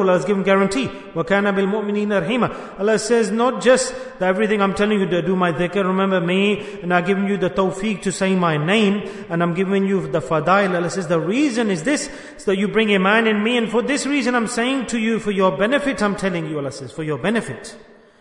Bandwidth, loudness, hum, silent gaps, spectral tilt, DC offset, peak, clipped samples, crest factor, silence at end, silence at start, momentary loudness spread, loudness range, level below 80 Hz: 11 kHz; -19 LUFS; none; none; -5 dB/octave; under 0.1%; -2 dBFS; under 0.1%; 16 dB; 0.4 s; 0 s; 7 LU; 1 LU; -52 dBFS